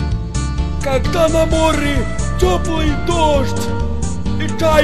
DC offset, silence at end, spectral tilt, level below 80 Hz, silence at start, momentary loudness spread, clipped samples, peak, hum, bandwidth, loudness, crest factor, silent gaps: 7%; 0 s; -5.5 dB/octave; -22 dBFS; 0 s; 7 LU; under 0.1%; 0 dBFS; none; 14 kHz; -17 LUFS; 16 dB; none